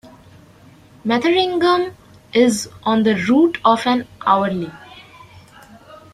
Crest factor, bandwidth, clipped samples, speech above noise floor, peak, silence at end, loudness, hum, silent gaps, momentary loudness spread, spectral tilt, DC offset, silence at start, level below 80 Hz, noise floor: 18 dB; 14 kHz; under 0.1%; 30 dB; -2 dBFS; 0.2 s; -17 LUFS; none; none; 9 LU; -4.5 dB/octave; under 0.1%; 0.05 s; -56 dBFS; -46 dBFS